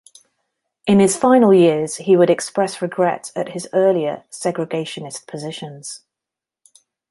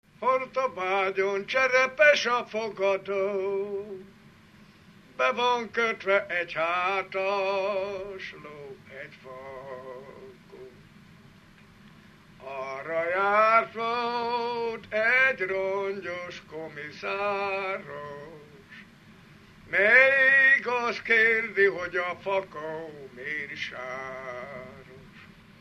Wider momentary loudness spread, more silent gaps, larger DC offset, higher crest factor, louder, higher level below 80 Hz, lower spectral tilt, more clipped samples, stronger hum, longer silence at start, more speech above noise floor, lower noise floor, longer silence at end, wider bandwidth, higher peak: second, 17 LU vs 22 LU; neither; neither; second, 16 dB vs 22 dB; first, -17 LUFS vs -25 LUFS; about the same, -62 dBFS vs -66 dBFS; first, -5.5 dB/octave vs -3.5 dB/octave; neither; neither; first, 0.85 s vs 0.2 s; first, 69 dB vs 27 dB; first, -87 dBFS vs -54 dBFS; first, 1.15 s vs 0.35 s; second, 11.5 kHz vs 13 kHz; first, -2 dBFS vs -6 dBFS